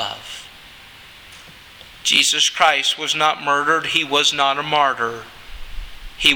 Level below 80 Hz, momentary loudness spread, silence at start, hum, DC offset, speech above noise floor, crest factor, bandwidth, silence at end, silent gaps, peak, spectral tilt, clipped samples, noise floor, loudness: -42 dBFS; 23 LU; 0 s; none; under 0.1%; 24 dB; 20 dB; over 20 kHz; 0 s; none; 0 dBFS; -0.5 dB/octave; under 0.1%; -42 dBFS; -17 LUFS